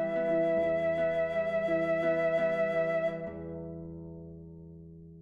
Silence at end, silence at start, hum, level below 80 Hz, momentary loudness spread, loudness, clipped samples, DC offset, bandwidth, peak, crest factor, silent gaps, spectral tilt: 0 s; 0 s; none; -62 dBFS; 20 LU; -30 LUFS; under 0.1%; under 0.1%; 7 kHz; -18 dBFS; 12 dB; none; -8 dB/octave